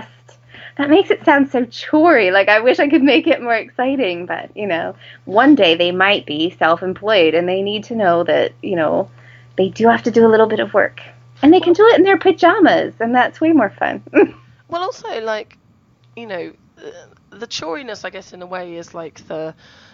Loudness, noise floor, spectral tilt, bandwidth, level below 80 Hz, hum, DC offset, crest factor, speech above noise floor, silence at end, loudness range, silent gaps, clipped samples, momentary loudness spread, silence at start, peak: -14 LUFS; -53 dBFS; -5.5 dB/octave; 7.4 kHz; -58 dBFS; none; under 0.1%; 16 dB; 38 dB; 0.4 s; 16 LU; none; under 0.1%; 18 LU; 0 s; 0 dBFS